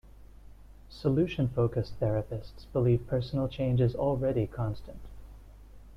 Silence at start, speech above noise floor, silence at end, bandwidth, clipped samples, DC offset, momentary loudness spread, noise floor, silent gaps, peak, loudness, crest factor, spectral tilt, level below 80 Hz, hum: 0.05 s; 21 dB; 0 s; 6.2 kHz; under 0.1%; under 0.1%; 15 LU; -50 dBFS; none; -14 dBFS; -30 LUFS; 16 dB; -9.5 dB/octave; -48 dBFS; none